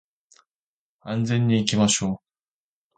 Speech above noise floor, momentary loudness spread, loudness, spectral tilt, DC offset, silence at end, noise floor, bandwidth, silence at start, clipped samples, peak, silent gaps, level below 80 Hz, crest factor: over 68 dB; 14 LU; -22 LUFS; -4.5 dB/octave; under 0.1%; 0.8 s; under -90 dBFS; 9.4 kHz; 1.05 s; under 0.1%; 0 dBFS; none; -56 dBFS; 24 dB